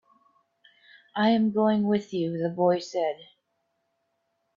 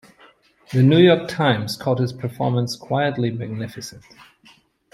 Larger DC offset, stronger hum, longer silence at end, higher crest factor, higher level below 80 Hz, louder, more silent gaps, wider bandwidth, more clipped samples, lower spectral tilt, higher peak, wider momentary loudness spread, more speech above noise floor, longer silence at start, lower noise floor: neither; neither; first, 1.35 s vs 0.95 s; about the same, 18 dB vs 18 dB; second, -72 dBFS vs -60 dBFS; second, -26 LUFS vs -20 LUFS; neither; second, 7.4 kHz vs 13.5 kHz; neither; about the same, -7 dB/octave vs -6.5 dB/octave; second, -10 dBFS vs -2 dBFS; second, 8 LU vs 16 LU; first, 52 dB vs 35 dB; first, 1.15 s vs 0.7 s; first, -76 dBFS vs -54 dBFS